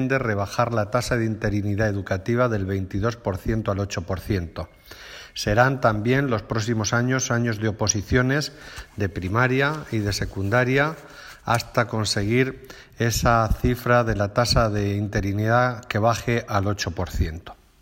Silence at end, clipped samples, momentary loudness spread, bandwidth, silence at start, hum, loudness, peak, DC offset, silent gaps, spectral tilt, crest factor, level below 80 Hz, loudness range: 0.3 s; under 0.1%; 9 LU; 16.5 kHz; 0 s; none; -23 LUFS; -4 dBFS; under 0.1%; none; -5 dB/octave; 18 dB; -38 dBFS; 3 LU